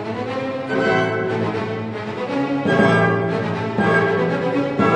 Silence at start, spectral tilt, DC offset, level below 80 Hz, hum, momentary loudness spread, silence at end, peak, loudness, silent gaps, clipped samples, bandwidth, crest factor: 0 s; -7 dB/octave; under 0.1%; -54 dBFS; none; 9 LU; 0 s; -2 dBFS; -20 LUFS; none; under 0.1%; 9.8 kHz; 16 dB